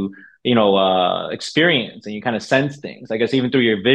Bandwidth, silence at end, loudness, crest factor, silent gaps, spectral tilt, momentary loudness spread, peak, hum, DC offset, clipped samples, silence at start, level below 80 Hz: 10 kHz; 0 s; -18 LUFS; 16 dB; none; -5.5 dB/octave; 11 LU; -2 dBFS; none; under 0.1%; under 0.1%; 0 s; -62 dBFS